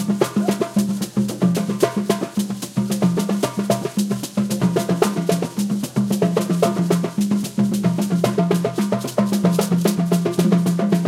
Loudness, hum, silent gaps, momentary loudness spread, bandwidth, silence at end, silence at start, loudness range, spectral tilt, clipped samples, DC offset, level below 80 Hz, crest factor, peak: -20 LUFS; none; none; 5 LU; 16 kHz; 0 s; 0 s; 2 LU; -6.5 dB/octave; under 0.1%; under 0.1%; -58 dBFS; 18 dB; -2 dBFS